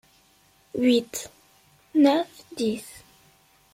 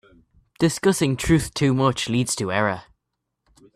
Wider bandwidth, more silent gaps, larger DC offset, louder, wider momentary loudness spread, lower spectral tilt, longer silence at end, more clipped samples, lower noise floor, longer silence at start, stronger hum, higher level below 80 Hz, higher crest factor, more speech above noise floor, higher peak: first, 16.5 kHz vs 14.5 kHz; neither; neither; second, -25 LUFS vs -21 LUFS; first, 16 LU vs 4 LU; about the same, -4 dB/octave vs -5 dB/octave; second, 0.75 s vs 0.95 s; neither; second, -60 dBFS vs -79 dBFS; first, 0.75 s vs 0.6 s; neither; second, -68 dBFS vs -44 dBFS; about the same, 20 dB vs 18 dB; second, 37 dB vs 59 dB; about the same, -8 dBFS vs -6 dBFS